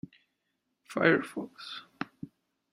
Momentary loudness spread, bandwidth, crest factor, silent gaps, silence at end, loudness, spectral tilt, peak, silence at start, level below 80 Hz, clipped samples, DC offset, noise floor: 23 LU; 14 kHz; 26 dB; none; 0.45 s; -31 LUFS; -6 dB/octave; -8 dBFS; 0.9 s; -74 dBFS; under 0.1%; under 0.1%; -81 dBFS